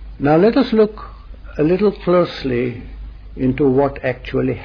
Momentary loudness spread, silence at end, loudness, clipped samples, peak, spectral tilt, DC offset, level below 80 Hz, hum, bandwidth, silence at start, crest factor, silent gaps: 21 LU; 0 s; -17 LUFS; under 0.1%; -2 dBFS; -9 dB/octave; under 0.1%; -36 dBFS; none; 5.4 kHz; 0 s; 14 dB; none